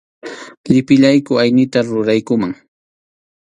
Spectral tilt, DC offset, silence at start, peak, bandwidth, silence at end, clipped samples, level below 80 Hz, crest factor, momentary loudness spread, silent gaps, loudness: -6.5 dB/octave; under 0.1%; 0.25 s; 0 dBFS; 9.4 kHz; 0.85 s; under 0.1%; -54 dBFS; 16 dB; 21 LU; 0.57-0.64 s; -14 LUFS